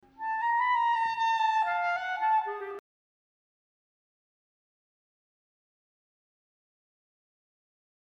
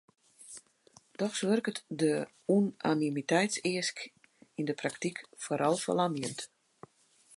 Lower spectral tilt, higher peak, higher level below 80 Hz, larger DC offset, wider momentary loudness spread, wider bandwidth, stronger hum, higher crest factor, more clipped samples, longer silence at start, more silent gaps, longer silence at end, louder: second, -1 dB/octave vs -4.5 dB/octave; second, -18 dBFS vs -14 dBFS; about the same, -78 dBFS vs -80 dBFS; neither; second, 11 LU vs 18 LU; second, 8 kHz vs 11.5 kHz; neither; second, 14 dB vs 20 dB; neither; second, 0.2 s vs 0.4 s; neither; first, 5.3 s vs 0.9 s; first, -28 LUFS vs -32 LUFS